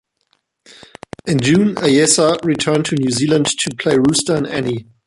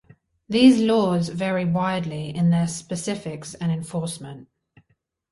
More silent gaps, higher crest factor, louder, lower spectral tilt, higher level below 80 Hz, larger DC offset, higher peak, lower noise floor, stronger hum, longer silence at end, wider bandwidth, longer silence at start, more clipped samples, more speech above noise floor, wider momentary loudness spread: neither; about the same, 16 dB vs 20 dB; first, -15 LUFS vs -22 LUFS; second, -4 dB/octave vs -6 dB/octave; first, -50 dBFS vs -58 dBFS; neither; first, 0 dBFS vs -4 dBFS; second, -65 dBFS vs -69 dBFS; neither; second, 0.25 s vs 0.9 s; about the same, 11.5 kHz vs 11.5 kHz; first, 1.25 s vs 0.5 s; neither; about the same, 50 dB vs 48 dB; second, 8 LU vs 15 LU